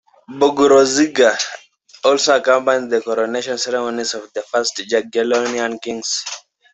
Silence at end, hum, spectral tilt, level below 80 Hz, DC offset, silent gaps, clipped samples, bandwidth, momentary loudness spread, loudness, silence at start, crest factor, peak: 0.35 s; none; -2 dB/octave; -62 dBFS; under 0.1%; none; under 0.1%; 8.4 kHz; 12 LU; -17 LUFS; 0.3 s; 16 dB; -2 dBFS